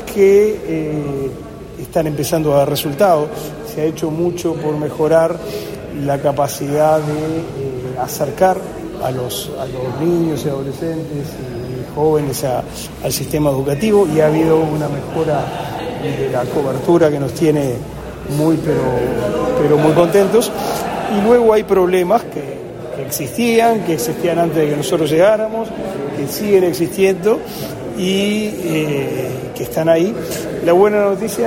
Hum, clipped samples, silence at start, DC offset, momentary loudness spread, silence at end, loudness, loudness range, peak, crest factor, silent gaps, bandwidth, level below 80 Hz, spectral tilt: none; under 0.1%; 0 s; under 0.1%; 12 LU; 0 s; -16 LUFS; 5 LU; 0 dBFS; 16 dB; none; 16.5 kHz; -42 dBFS; -6 dB/octave